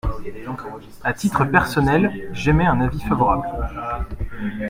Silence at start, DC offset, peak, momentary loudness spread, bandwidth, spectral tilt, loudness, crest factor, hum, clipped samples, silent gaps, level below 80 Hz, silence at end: 0.05 s; under 0.1%; 0 dBFS; 14 LU; 16.5 kHz; -7 dB/octave; -20 LUFS; 20 dB; none; under 0.1%; none; -32 dBFS; 0 s